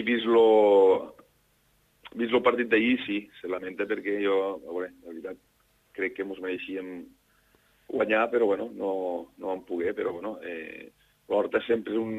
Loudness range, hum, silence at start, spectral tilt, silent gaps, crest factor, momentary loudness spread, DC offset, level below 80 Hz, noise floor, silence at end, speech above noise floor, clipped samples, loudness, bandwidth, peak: 8 LU; none; 0 s; -6.5 dB/octave; none; 20 dB; 20 LU; under 0.1%; -70 dBFS; -67 dBFS; 0 s; 40 dB; under 0.1%; -27 LUFS; 7.8 kHz; -8 dBFS